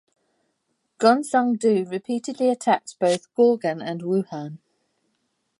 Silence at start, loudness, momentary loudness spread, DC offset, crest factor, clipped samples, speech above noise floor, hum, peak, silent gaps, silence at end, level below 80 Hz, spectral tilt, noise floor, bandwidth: 1 s; -22 LUFS; 10 LU; under 0.1%; 20 dB; under 0.1%; 52 dB; none; -4 dBFS; none; 1.05 s; -78 dBFS; -5.5 dB/octave; -74 dBFS; 11.5 kHz